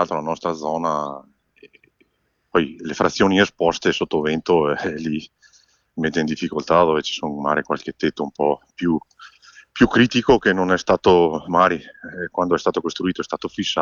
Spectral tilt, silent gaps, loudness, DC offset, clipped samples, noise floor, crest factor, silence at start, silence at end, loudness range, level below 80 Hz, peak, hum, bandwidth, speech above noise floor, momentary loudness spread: -5 dB/octave; none; -20 LUFS; under 0.1%; under 0.1%; -68 dBFS; 18 dB; 0 s; 0 s; 4 LU; -48 dBFS; -2 dBFS; none; 7.4 kHz; 49 dB; 11 LU